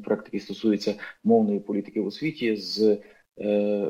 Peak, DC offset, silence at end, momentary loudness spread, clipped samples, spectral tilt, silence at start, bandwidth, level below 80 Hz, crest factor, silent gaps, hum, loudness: -8 dBFS; under 0.1%; 0 s; 8 LU; under 0.1%; -6.5 dB/octave; 0 s; 8.2 kHz; -74 dBFS; 16 dB; none; none; -26 LUFS